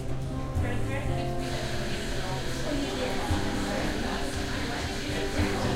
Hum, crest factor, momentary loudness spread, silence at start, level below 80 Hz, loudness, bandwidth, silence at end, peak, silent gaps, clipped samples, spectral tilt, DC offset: none; 16 dB; 3 LU; 0 s; -36 dBFS; -31 LUFS; 16 kHz; 0 s; -14 dBFS; none; under 0.1%; -5 dB/octave; under 0.1%